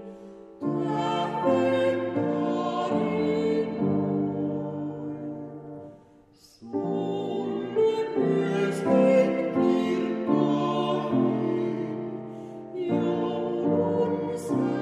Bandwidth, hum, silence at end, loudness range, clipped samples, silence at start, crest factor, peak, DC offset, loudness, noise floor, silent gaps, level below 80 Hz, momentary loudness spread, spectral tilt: 11.5 kHz; none; 0 s; 7 LU; under 0.1%; 0 s; 16 dB; -10 dBFS; under 0.1%; -26 LUFS; -56 dBFS; none; -68 dBFS; 12 LU; -7.5 dB/octave